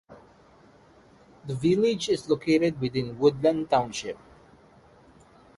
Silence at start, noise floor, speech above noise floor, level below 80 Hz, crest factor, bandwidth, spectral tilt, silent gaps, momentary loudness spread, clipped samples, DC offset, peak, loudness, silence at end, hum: 0.1 s; -56 dBFS; 31 dB; -60 dBFS; 20 dB; 11.5 kHz; -6 dB/octave; none; 14 LU; under 0.1%; under 0.1%; -8 dBFS; -25 LUFS; 1.4 s; none